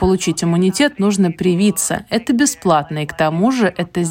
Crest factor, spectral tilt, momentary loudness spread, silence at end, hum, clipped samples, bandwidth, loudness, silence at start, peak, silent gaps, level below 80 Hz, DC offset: 14 dB; -5 dB/octave; 4 LU; 0 s; none; under 0.1%; 16.5 kHz; -16 LUFS; 0 s; -2 dBFS; none; -40 dBFS; under 0.1%